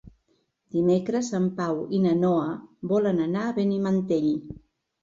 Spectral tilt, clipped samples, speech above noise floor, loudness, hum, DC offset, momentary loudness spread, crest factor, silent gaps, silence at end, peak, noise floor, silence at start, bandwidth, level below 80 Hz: -7.5 dB/octave; under 0.1%; 46 dB; -25 LUFS; none; under 0.1%; 8 LU; 14 dB; none; 0.45 s; -12 dBFS; -70 dBFS; 0.05 s; 7.6 kHz; -60 dBFS